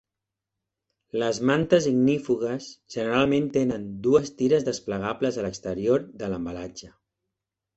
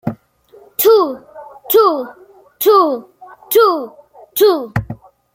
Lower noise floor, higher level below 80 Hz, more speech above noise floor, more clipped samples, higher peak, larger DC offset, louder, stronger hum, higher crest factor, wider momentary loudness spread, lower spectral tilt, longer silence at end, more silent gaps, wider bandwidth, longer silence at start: first, -87 dBFS vs -46 dBFS; second, -56 dBFS vs -48 dBFS; first, 62 dB vs 33 dB; neither; second, -6 dBFS vs -2 dBFS; neither; second, -25 LUFS vs -14 LUFS; neither; first, 20 dB vs 14 dB; second, 12 LU vs 20 LU; about the same, -6 dB/octave vs -5 dB/octave; first, 0.9 s vs 0.4 s; neither; second, 8.2 kHz vs 16.5 kHz; first, 1.15 s vs 0.05 s